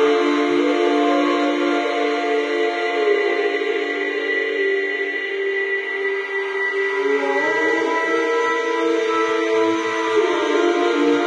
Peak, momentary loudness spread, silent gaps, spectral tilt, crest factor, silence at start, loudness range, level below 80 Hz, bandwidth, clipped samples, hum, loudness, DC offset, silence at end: -6 dBFS; 4 LU; none; -3 dB/octave; 12 dB; 0 s; 2 LU; -82 dBFS; 9.8 kHz; under 0.1%; none; -19 LUFS; under 0.1%; 0 s